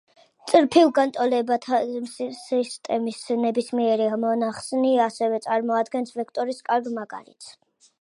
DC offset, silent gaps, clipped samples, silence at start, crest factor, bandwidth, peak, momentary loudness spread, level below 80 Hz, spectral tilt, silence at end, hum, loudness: under 0.1%; none; under 0.1%; 0.45 s; 20 dB; 11.5 kHz; -4 dBFS; 13 LU; -74 dBFS; -4.5 dB/octave; 0.5 s; none; -23 LUFS